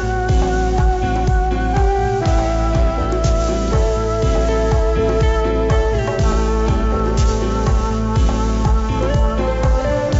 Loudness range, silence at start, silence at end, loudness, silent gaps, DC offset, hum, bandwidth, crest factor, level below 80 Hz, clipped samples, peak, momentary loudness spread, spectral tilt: 1 LU; 0 s; 0 s; -17 LUFS; none; under 0.1%; none; 8 kHz; 12 dB; -18 dBFS; under 0.1%; -4 dBFS; 2 LU; -6.5 dB/octave